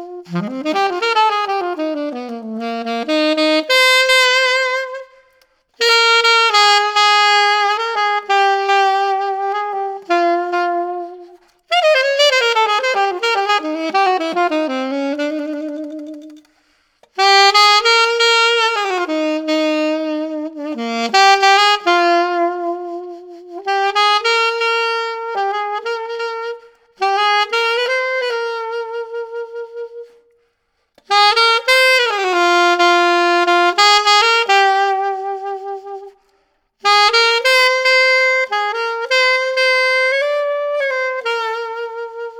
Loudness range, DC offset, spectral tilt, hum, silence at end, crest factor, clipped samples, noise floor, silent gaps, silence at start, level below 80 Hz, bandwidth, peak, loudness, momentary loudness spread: 6 LU; under 0.1%; -1.5 dB/octave; none; 0 s; 14 dB; under 0.1%; -67 dBFS; none; 0 s; -66 dBFS; 19 kHz; -2 dBFS; -14 LUFS; 15 LU